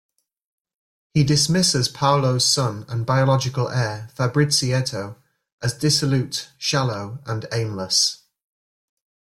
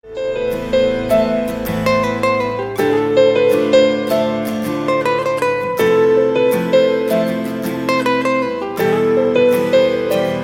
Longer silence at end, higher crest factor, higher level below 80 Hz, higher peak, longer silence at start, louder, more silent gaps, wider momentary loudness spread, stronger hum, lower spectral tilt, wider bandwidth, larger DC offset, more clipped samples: first, 1.15 s vs 0 s; about the same, 18 dB vs 14 dB; second, -54 dBFS vs -44 dBFS; second, -4 dBFS vs 0 dBFS; first, 1.15 s vs 0.05 s; second, -20 LUFS vs -16 LUFS; first, 5.52-5.58 s vs none; first, 10 LU vs 7 LU; neither; second, -4 dB/octave vs -5.5 dB/octave; second, 15 kHz vs 17 kHz; neither; neither